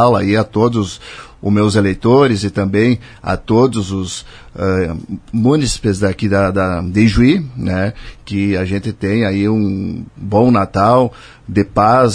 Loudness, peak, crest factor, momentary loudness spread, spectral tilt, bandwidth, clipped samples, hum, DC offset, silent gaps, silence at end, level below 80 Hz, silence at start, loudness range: -15 LUFS; 0 dBFS; 14 dB; 12 LU; -6.5 dB/octave; 10.5 kHz; under 0.1%; none; under 0.1%; none; 0 s; -36 dBFS; 0 s; 2 LU